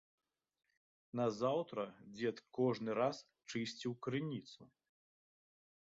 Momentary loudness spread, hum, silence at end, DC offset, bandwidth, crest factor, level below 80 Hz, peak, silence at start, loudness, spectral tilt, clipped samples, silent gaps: 11 LU; none; 1.25 s; under 0.1%; 7.6 kHz; 18 dB; -82 dBFS; -24 dBFS; 1.15 s; -41 LUFS; -5 dB/octave; under 0.1%; none